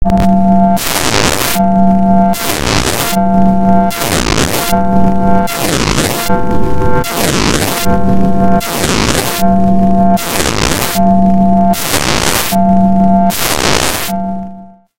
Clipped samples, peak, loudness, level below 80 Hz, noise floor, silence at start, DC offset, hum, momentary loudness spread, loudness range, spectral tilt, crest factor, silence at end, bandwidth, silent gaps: 0.2%; 0 dBFS; -11 LUFS; -26 dBFS; -32 dBFS; 0 s; under 0.1%; none; 4 LU; 2 LU; -4.5 dB/octave; 10 dB; 0.25 s; 17.5 kHz; none